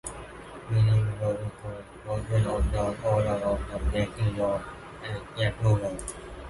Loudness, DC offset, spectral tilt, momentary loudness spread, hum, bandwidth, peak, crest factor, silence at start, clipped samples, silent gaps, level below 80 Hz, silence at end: -28 LUFS; under 0.1%; -6.5 dB/octave; 15 LU; none; 11.5 kHz; -12 dBFS; 16 dB; 0.05 s; under 0.1%; none; -38 dBFS; 0 s